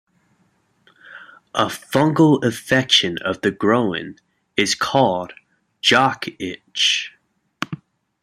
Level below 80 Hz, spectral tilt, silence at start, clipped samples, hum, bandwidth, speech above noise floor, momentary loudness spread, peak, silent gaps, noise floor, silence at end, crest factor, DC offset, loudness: -60 dBFS; -4 dB/octave; 1.05 s; under 0.1%; none; 15 kHz; 44 dB; 15 LU; 0 dBFS; none; -63 dBFS; 0.45 s; 20 dB; under 0.1%; -18 LUFS